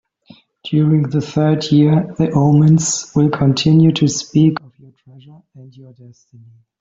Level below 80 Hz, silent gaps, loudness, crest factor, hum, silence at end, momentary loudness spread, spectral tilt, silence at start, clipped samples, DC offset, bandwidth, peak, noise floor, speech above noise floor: -50 dBFS; none; -14 LUFS; 14 dB; none; 1.2 s; 6 LU; -6 dB/octave; 0.65 s; under 0.1%; under 0.1%; 7.8 kHz; -2 dBFS; -47 dBFS; 33 dB